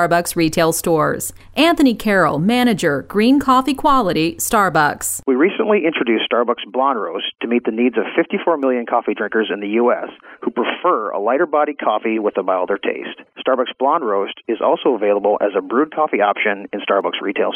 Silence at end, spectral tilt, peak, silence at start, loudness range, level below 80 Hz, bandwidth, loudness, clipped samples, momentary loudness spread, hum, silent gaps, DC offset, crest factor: 0 s; -4.5 dB/octave; -2 dBFS; 0 s; 4 LU; -48 dBFS; 16 kHz; -17 LUFS; under 0.1%; 6 LU; none; none; under 0.1%; 14 dB